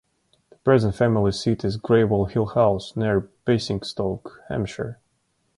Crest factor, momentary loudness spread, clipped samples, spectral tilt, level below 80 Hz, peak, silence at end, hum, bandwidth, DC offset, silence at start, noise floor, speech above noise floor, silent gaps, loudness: 18 dB; 10 LU; under 0.1%; -7 dB/octave; -46 dBFS; -6 dBFS; 0.65 s; none; 11.5 kHz; under 0.1%; 0.65 s; -70 dBFS; 48 dB; none; -23 LUFS